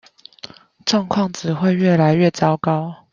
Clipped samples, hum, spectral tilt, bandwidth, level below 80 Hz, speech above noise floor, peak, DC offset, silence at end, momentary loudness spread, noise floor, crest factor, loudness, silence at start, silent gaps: under 0.1%; none; -6.5 dB/octave; 7.6 kHz; -58 dBFS; 24 dB; -2 dBFS; under 0.1%; 0.2 s; 22 LU; -41 dBFS; 16 dB; -18 LUFS; 0.45 s; none